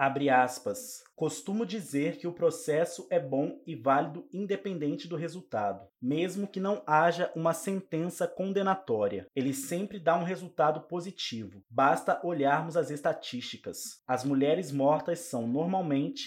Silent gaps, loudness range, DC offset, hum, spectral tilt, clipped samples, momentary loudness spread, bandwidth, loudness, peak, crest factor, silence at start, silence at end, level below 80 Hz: none; 2 LU; under 0.1%; none; -5.5 dB/octave; under 0.1%; 10 LU; 16.5 kHz; -31 LUFS; -10 dBFS; 20 dB; 0 s; 0 s; -80 dBFS